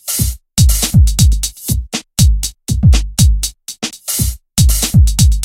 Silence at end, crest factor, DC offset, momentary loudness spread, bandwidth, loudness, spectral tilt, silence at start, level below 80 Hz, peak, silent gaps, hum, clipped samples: 0 s; 12 dB; under 0.1%; 9 LU; 17 kHz; -14 LUFS; -4 dB/octave; 0.05 s; -14 dBFS; 0 dBFS; none; none; under 0.1%